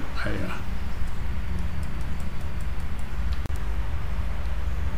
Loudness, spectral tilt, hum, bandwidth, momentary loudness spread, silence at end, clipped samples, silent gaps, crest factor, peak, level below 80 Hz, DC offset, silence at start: -32 LUFS; -6.5 dB/octave; none; 15.5 kHz; 3 LU; 0 s; under 0.1%; none; 14 dB; -12 dBFS; -30 dBFS; 6%; 0 s